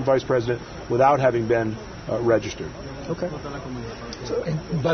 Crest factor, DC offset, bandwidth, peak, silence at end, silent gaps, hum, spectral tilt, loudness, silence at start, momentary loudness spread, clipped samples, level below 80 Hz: 18 dB; under 0.1%; 6.6 kHz; -6 dBFS; 0 s; none; none; -6.5 dB/octave; -24 LUFS; 0 s; 15 LU; under 0.1%; -46 dBFS